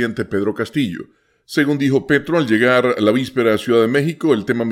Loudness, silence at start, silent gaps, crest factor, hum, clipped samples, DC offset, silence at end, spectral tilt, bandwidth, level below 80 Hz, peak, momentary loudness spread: -17 LUFS; 0 s; none; 16 dB; none; under 0.1%; under 0.1%; 0 s; -6.5 dB/octave; 16 kHz; -56 dBFS; -2 dBFS; 7 LU